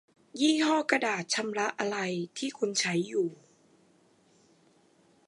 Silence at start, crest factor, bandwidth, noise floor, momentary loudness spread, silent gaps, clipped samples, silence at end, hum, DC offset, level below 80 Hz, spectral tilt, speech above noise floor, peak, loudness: 0.35 s; 24 dB; 11.5 kHz; -65 dBFS; 8 LU; none; under 0.1%; 1.95 s; none; under 0.1%; -84 dBFS; -3.5 dB/octave; 35 dB; -8 dBFS; -29 LUFS